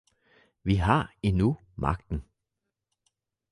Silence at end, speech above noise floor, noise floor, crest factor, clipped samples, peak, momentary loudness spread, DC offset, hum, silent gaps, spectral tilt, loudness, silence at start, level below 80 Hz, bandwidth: 1.3 s; 59 dB; -85 dBFS; 22 dB; under 0.1%; -8 dBFS; 12 LU; under 0.1%; none; none; -8 dB/octave; -28 LUFS; 0.65 s; -40 dBFS; 11 kHz